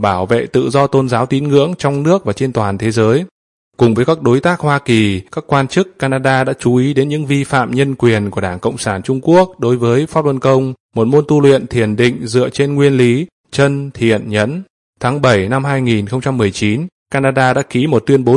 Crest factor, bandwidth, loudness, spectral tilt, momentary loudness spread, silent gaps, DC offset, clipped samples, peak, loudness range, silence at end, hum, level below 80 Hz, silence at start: 14 dB; 11.5 kHz; -14 LUFS; -6.5 dB/octave; 6 LU; 3.31-3.71 s, 10.80-10.89 s, 13.32-13.44 s, 14.70-14.93 s, 16.92-17.06 s; under 0.1%; under 0.1%; 0 dBFS; 2 LU; 0 s; none; -48 dBFS; 0 s